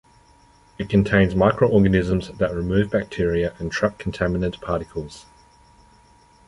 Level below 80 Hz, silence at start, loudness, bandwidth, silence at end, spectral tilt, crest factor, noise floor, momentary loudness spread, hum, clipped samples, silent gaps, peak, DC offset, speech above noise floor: -38 dBFS; 0.8 s; -21 LUFS; 11 kHz; 1.25 s; -7.5 dB/octave; 20 dB; -54 dBFS; 10 LU; none; under 0.1%; none; -2 dBFS; under 0.1%; 33 dB